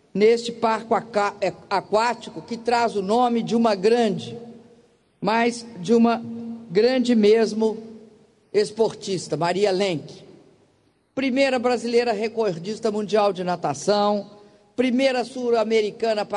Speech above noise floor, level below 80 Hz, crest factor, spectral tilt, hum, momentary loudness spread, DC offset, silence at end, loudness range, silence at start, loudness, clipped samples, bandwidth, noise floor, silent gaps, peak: 41 dB; -66 dBFS; 16 dB; -5 dB/octave; none; 11 LU; under 0.1%; 0 s; 3 LU; 0.15 s; -22 LUFS; under 0.1%; 10.5 kHz; -63 dBFS; none; -6 dBFS